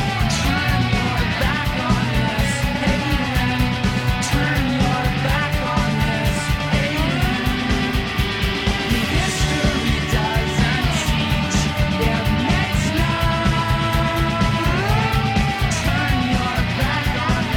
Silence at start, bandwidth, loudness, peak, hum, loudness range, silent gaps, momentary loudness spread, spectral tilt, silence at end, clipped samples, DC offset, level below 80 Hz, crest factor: 0 s; 17.5 kHz; -19 LUFS; -8 dBFS; none; 1 LU; none; 2 LU; -5 dB/octave; 0 s; under 0.1%; under 0.1%; -26 dBFS; 12 dB